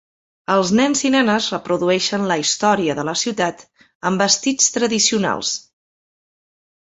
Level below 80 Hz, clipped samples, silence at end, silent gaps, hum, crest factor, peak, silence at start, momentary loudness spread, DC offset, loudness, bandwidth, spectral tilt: -60 dBFS; under 0.1%; 1.25 s; 3.95-4.00 s; none; 18 dB; -2 dBFS; 0.5 s; 7 LU; under 0.1%; -18 LUFS; 8.4 kHz; -3 dB/octave